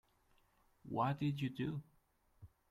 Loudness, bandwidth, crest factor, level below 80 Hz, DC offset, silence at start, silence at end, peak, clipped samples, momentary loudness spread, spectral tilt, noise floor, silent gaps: -41 LUFS; 13.5 kHz; 20 dB; -72 dBFS; under 0.1%; 0.85 s; 0.25 s; -24 dBFS; under 0.1%; 8 LU; -8 dB/octave; -75 dBFS; none